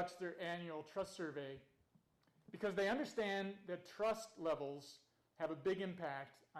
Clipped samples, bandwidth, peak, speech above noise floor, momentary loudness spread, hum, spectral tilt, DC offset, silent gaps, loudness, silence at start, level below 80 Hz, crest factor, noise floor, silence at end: under 0.1%; 14.5 kHz; -30 dBFS; 33 dB; 12 LU; none; -5 dB/octave; under 0.1%; none; -44 LUFS; 0 s; -78 dBFS; 14 dB; -77 dBFS; 0 s